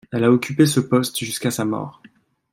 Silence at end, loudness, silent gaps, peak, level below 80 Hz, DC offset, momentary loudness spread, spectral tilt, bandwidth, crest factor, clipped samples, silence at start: 0.65 s; -20 LUFS; none; -2 dBFS; -62 dBFS; under 0.1%; 9 LU; -5.5 dB/octave; 16.5 kHz; 18 dB; under 0.1%; 0.1 s